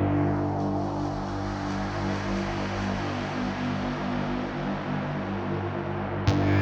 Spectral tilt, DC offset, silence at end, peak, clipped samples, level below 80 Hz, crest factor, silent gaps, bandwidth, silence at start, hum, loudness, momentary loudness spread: -7 dB/octave; under 0.1%; 0 s; -8 dBFS; under 0.1%; -44 dBFS; 20 dB; none; 8 kHz; 0 s; 50 Hz at -55 dBFS; -29 LUFS; 5 LU